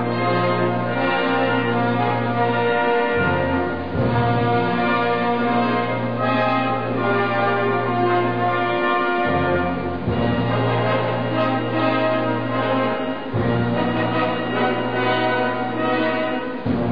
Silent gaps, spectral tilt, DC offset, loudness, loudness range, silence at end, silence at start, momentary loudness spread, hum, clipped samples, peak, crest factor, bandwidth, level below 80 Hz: none; -9 dB/octave; 1%; -20 LUFS; 1 LU; 0 s; 0 s; 3 LU; none; under 0.1%; -8 dBFS; 12 dB; 5.2 kHz; -48 dBFS